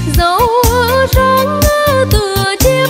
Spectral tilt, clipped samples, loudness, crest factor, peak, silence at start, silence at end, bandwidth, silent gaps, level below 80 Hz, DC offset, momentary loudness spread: -4.5 dB/octave; under 0.1%; -11 LUFS; 10 dB; 0 dBFS; 0 s; 0 s; 16.5 kHz; none; -18 dBFS; under 0.1%; 2 LU